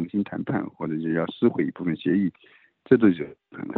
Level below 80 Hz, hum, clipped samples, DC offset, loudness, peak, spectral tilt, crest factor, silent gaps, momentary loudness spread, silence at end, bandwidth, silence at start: -64 dBFS; none; under 0.1%; under 0.1%; -24 LUFS; -4 dBFS; -10.5 dB/octave; 22 dB; none; 11 LU; 0 s; 4.2 kHz; 0 s